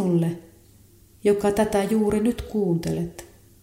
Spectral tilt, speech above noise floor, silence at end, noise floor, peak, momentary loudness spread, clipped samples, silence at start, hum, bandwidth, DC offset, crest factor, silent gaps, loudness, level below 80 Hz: -7 dB/octave; 31 dB; 0.35 s; -53 dBFS; -8 dBFS; 10 LU; under 0.1%; 0 s; none; 16 kHz; under 0.1%; 16 dB; none; -23 LUFS; -46 dBFS